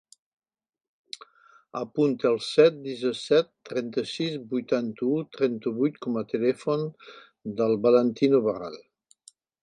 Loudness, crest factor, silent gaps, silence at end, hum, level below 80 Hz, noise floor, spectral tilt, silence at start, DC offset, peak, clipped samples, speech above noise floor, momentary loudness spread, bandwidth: -26 LUFS; 20 dB; none; 0.85 s; none; -74 dBFS; -58 dBFS; -6 dB/octave; 1.75 s; under 0.1%; -6 dBFS; under 0.1%; 33 dB; 17 LU; 11 kHz